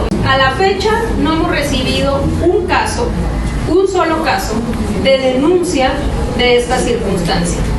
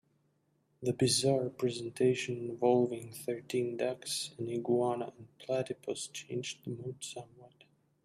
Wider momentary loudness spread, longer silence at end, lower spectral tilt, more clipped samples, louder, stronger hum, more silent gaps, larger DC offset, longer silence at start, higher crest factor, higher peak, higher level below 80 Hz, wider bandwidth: second, 6 LU vs 13 LU; second, 0 s vs 0.55 s; about the same, -5 dB/octave vs -4.5 dB/octave; neither; first, -14 LUFS vs -34 LUFS; neither; neither; neither; second, 0 s vs 0.8 s; second, 14 dB vs 20 dB; first, 0 dBFS vs -16 dBFS; first, -22 dBFS vs -74 dBFS; second, 12.5 kHz vs 15 kHz